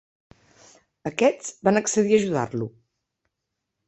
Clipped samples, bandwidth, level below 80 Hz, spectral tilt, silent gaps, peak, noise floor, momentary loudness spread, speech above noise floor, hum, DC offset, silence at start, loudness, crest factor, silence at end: under 0.1%; 8.4 kHz; -64 dBFS; -5 dB/octave; none; -6 dBFS; -82 dBFS; 12 LU; 60 dB; none; under 0.1%; 1.05 s; -23 LUFS; 20 dB; 1.2 s